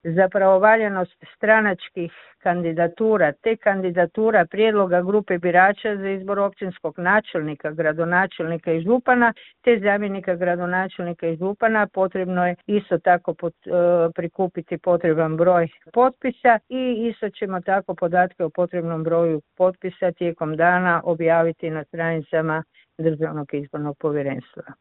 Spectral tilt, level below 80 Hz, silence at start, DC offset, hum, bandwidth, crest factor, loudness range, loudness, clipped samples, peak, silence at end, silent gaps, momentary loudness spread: -11.5 dB/octave; -62 dBFS; 0.05 s; under 0.1%; none; 4.1 kHz; 18 dB; 3 LU; -21 LUFS; under 0.1%; -2 dBFS; 0.05 s; none; 9 LU